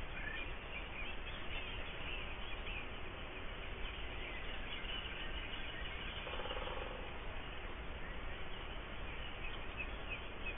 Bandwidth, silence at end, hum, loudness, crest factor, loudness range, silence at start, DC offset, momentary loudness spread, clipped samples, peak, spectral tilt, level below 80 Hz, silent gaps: 3.8 kHz; 0 s; none; -45 LUFS; 14 dB; 2 LU; 0 s; under 0.1%; 4 LU; under 0.1%; -30 dBFS; -1.5 dB/octave; -48 dBFS; none